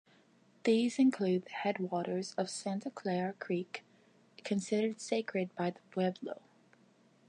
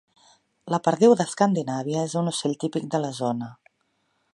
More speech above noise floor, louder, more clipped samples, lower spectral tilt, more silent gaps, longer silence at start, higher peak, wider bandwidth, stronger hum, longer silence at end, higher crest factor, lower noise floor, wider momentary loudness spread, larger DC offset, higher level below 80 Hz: second, 32 dB vs 48 dB; second, -35 LUFS vs -24 LUFS; neither; about the same, -5.5 dB/octave vs -5.5 dB/octave; neither; about the same, 0.65 s vs 0.65 s; second, -18 dBFS vs -4 dBFS; about the same, 11 kHz vs 11.5 kHz; neither; first, 0.95 s vs 0.8 s; about the same, 18 dB vs 20 dB; second, -66 dBFS vs -71 dBFS; about the same, 11 LU vs 10 LU; neither; second, -86 dBFS vs -72 dBFS